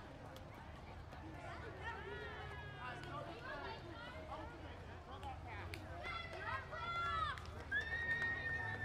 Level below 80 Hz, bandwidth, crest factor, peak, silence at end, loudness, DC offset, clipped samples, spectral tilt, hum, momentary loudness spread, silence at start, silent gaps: -58 dBFS; 15.5 kHz; 16 dB; -30 dBFS; 0 s; -46 LUFS; under 0.1%; under 0.1%; -5 dB/octave; none; 14 LU; 0 s; none